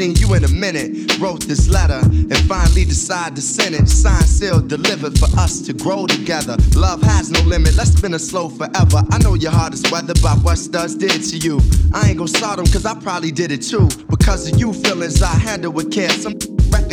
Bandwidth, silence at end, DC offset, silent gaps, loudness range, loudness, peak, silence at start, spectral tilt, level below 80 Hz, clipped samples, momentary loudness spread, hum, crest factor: 15.5 kHz; 0 s; under 0.1%; none; 2 LU; -15 LUFS; -2 dBFS; 0 s; -5 dB/octave; -18 dBFS; under 0.1%; 6 LU; none; 12 dB